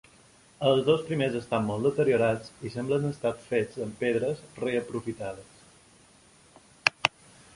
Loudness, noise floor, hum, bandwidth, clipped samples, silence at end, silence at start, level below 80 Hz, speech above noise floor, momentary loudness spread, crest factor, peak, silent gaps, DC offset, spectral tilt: -28 LUFS; -58 dBFS; none; 11.5 kHz; under 0.1%; 0.5 s; 0.6 s; -62 dBFS; 30 dB; 11 LU; 28 dB; -2 dBFS; none; under 0.1%; -5.5 dB/octave